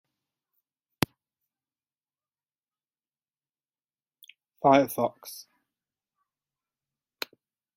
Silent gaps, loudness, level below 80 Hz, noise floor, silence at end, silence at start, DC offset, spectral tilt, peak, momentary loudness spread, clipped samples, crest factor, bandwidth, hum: none; -26 LUFS; -66 dBFS; under -90 dBFS; 2.35 s; 4.65 s; under 0.1%; -5 dB/octave; -2 dBFS; 22 LU; under 0.1%; 32 dB; 16.5 kHz; none